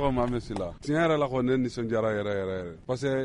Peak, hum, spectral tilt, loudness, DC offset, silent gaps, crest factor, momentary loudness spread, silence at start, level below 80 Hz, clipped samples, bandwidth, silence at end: -12 dBFS; none; -7 dB/octave; -28 LUFS; under 0.1%; none; 16 dB; 9 LU; 0 s; -46 dBFS; under 0.1%; 11 kHz; 0 s